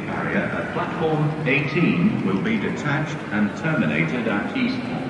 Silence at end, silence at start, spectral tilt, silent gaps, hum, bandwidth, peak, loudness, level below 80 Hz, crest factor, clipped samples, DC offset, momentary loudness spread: 0 s; 0 s; -7 dB/octave; none; none; 10.5 kHz; -6 dBFS; -22 LUFS; -54 dBFS; 16 dB; under 0.1%; under 0.1%; 5 LU